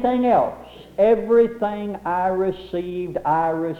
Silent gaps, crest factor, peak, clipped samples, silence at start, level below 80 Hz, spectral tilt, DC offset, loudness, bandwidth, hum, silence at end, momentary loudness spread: none; 14 dB; -6 dBFS; under 0.1%; 0 s; -50 dBFS; -8 dB/octave; under 0.1%; -21 LUFS; 6 kHz; none; 0 s; 10 LU